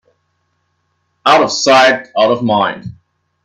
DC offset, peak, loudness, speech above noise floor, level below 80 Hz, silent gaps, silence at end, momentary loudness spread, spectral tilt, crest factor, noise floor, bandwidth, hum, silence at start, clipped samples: under 0.1%; 0 dBFS; -11 LUFS; 53 dB; -56 dBFS; none; 0.55 s; 11 LU; -3.5 dB/octave; 14 dB; -65 dBFS; 12 kHz; none; 1.25 s; under 0.1%